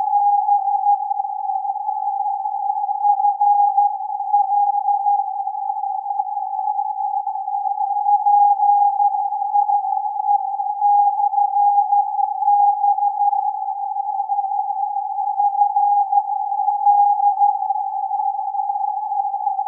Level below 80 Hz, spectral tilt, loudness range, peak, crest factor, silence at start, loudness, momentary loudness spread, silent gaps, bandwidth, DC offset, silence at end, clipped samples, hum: under -90 dBFS; -3.5 dB/octave; 3 LU; -6 dBFS; 12 dB; 0 s; -19 LUFS; 8 LU; none; 1 kHz; under 0.1%; 0 s; under 0.1%; none